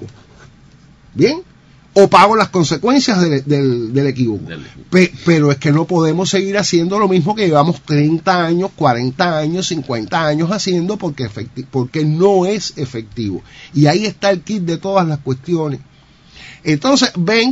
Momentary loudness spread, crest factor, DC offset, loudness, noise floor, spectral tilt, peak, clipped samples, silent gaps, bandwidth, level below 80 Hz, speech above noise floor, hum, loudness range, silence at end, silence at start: 11 LU; 14 dB; under 0.1%; -15 LUFS; -44 dBFS; -5.5 dB/octave; 0 dBFS; 0.2%; none; 11 kHz; -50 dBFS; 30 dB; none; 4 LU; 0 s; 0 s